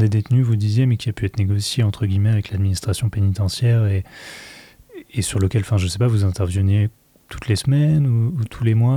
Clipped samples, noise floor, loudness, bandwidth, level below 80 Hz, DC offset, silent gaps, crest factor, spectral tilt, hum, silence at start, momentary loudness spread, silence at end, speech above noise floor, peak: under 0.1%; -42 dBFS; -19 LUFS; 14 kHz; -46 dBFS; under 0.1%; none; 12 dB; -6.5 dB/octave; none; 0 s; 8 LU; 0 s; 24 dB; -6 dBFS